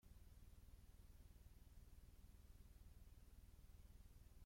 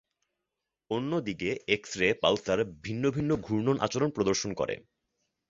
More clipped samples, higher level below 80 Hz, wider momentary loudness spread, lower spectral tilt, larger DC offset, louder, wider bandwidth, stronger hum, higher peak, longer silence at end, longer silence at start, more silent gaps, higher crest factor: neither; second, -66 dBFS vs -58 dBFS; second, 1 LU vs 7 LU; about the same, -5.5 dB/octave vs -5 dB/octave; neither; second, -69 LUFS vs -29 LUFS; first, 16.5 kHz vs 7.8 kHz; neither; second, -54 dBFS vs -8 dBFS; second, 0 s vs 0.7 s; second, 0.05 s vs 0.9 s; neither; second, 10 dB vs 22 dB